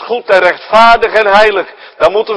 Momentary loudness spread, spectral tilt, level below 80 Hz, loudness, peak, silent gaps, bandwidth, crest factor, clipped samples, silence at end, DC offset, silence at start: 7 LU; -3.5 dB/octave; -38 dBFS; -8 LUFS; 0 dBFS; none; 11 kHz; 10 dB; 3%; 0 s; under 0.1%; 0 s